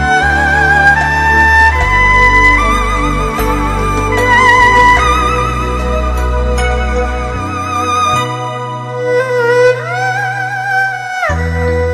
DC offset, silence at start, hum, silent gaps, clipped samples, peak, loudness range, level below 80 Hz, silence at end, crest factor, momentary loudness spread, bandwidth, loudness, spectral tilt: under 0.1%; 0 s; none; none; 0.2%; 0 dBFS; 6 LU; -20 dBFS; 0 s; 10 dB; 10 LU; 13 kHz; -11 LUFS; -5 dB/octave